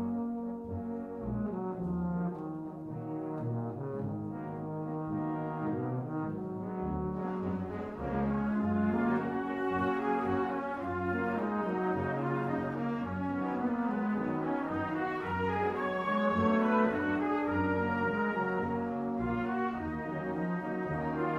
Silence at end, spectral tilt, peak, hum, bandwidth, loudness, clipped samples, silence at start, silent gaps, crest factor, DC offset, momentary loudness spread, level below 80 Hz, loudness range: 0 s; -9 dB/octave; -14 dBFS; none; 7 kHz; -33 LUFS; under 0.1%; 0 s; none; 18 dB; under 0.1%; 8 LU; -56 dBFS; 6 LU